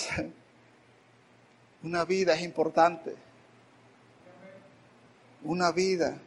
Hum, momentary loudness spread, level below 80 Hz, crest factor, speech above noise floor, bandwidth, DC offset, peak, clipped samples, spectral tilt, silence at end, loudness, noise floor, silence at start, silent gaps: none; 20 LU; -66 dBFS; 22 dB; 32 dB; 11.5 kHz; under 0.1%; -8 dBFS; under 0.1%; -4.5 dB/octave; 0.05 s; -28 LUFS; -60 dBFS; 0 s; none